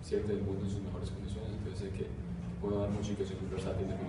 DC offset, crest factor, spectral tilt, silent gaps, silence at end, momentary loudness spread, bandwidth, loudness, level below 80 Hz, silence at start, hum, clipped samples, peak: under 0.1%; 14 dB; -7.5 dB/octave; none; 0 s; 6 LU; 11 kHz; -38 LUFS; -46 dBFS; 0 s; none; under 0.1%; -22 dBFS